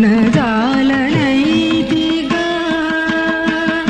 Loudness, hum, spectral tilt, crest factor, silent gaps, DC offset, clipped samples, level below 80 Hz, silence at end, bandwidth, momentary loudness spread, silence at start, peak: -14 LUFS; none; -6 dB/octave; 14 dB; none; under 0.1%; under 0.1%; -42 dBFS; 0 s; 9 kHz; 3 LU; 0 s; 0 dBFS